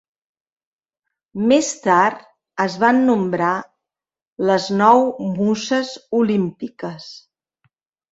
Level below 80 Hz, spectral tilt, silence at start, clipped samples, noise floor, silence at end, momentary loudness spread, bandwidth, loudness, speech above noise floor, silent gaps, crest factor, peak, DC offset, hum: -62 dBFS; -5 dB/octave; 1.35 s; under 0.1%; -88 dBFS; 0.95 s; 16 LU; 8 kHz; -18 LUFS; 70 dB; 4.22-4.36 s; 18 dB; -2 dBFS; under 0.1%; none